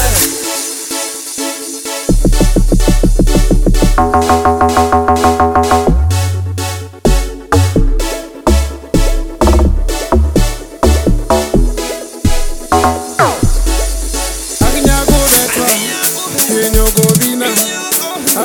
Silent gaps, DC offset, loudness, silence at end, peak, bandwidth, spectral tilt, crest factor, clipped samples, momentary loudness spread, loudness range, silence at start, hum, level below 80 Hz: none; under 0.1%; -12 LUFS; 0 s; 0 dBFS; 19.5 kHz; -4 dB/octave; 12 dB; under 0.1%; 8 LU; 4 LU; 0 s; none; -14 dBFS